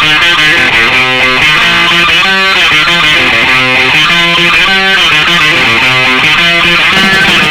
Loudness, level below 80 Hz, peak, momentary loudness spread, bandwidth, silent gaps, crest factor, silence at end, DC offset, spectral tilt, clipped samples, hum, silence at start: -4 LUFS; -32 dBFS; 0 dBFS; 1 LU; 18 kHz; none; 6 dB; 0 s; under 0.1%; -2.5 dB/octave; 0.7%; none; 0 s